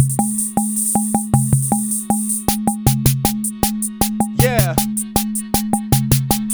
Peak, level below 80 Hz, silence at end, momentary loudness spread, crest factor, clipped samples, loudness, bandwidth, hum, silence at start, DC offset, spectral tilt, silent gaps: -2 dBFS; -34 dBFS; 0 s; 4 LU; 16 dB; under 0.1%; -17 LUFS; over 20 kHz; none; 0 s; under 0.1%; -4.5 dB/octave; none